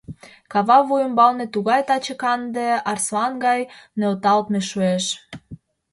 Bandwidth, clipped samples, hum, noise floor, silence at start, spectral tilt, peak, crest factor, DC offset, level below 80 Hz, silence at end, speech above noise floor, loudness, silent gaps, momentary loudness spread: 11.5 kHz; under 0.1%; none; -43 dBFS; 0.1 s; -4 dB/octave; -2 dBFS; 18 dB; under 0.1%; -60 dBFS; 0.35 s; 23 dB; -20 LUFS; none; 10 LU